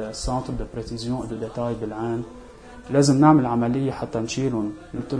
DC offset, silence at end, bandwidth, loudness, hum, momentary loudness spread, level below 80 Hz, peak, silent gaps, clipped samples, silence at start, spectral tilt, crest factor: under 0.1%; 0 s; 10.5 kHz; -23 LUFS; none; 15 LU; -42 dBFS; -2 dBFS; none; under 0.1%; 0 s; -6.5 dB/octave; 20 dB